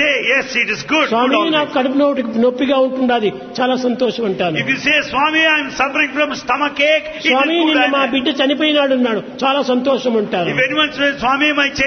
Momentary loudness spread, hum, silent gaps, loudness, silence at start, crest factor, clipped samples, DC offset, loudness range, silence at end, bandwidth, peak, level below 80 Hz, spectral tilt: 5 LU; none; none; -15 LUFS; 0 s; 14 dB; under 0.1%; under 0.1%; 2 LU; 0 s; 6.6 kHz; -2 dBFS; -52 dBFS; -4 dB/octave